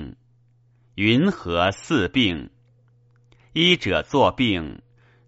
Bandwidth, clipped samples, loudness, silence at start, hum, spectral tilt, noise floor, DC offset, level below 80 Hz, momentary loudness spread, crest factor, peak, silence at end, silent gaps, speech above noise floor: 8 kHz; under 0.1%; -21 LUFS; 0 s; none; -3.5 dB/octave; -58 dBFS; under 0.1%; -48 dBFS; 14 LU; 22 dB; -2 dBFS; 0.5 s; none; 38 dB